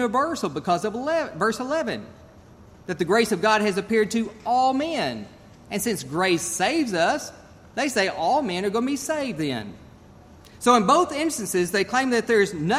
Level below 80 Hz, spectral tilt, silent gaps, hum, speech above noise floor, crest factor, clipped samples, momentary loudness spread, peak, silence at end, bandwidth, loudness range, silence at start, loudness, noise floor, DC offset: -58 dBFS; -4 dB/octave; none; none; 25 dB; 20 dB; under 0.1%; 9 LU; -4 dBFS; 0 s; 15.5 kHz; 2 LU; 0 s; -23 LUFS; -48 dBFS; under 0.1%